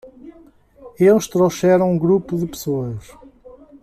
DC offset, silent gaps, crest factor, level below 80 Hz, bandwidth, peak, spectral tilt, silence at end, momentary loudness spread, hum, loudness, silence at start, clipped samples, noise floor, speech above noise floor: under 0.1%; none; 16 dB; -50 dBFS; 14.5 kHz; -4 dBFS; -6.5 dB/octave; 0.85 s; 10 LU; none; -17 LUFS; 0.05 s; under 0.1%; -49 dBFS; 32 dB